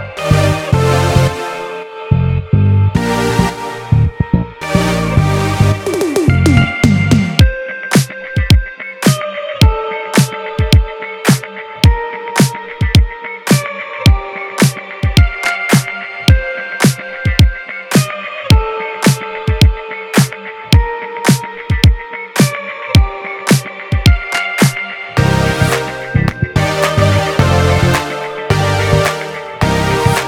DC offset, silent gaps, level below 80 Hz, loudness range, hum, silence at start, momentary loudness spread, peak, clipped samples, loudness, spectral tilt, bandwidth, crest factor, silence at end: under 0.1%; none; -22 dBFS; 2 LU; none; 0 s; 8 LU; 0 dBFS; 0.3%; -14 LUFS; -5.5 dB/octave; 18 kHz; 12 dB; 0 s